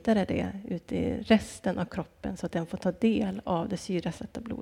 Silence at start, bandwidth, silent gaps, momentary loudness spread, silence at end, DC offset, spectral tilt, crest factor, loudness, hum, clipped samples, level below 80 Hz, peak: 0 s; 12 kHz; none; 11 LU; 0 s; under 0.1%; -6.5 dB/octave; 22 dB; -30 LUFS; none; under 0.1%; -52 dBFS; -8 dBFS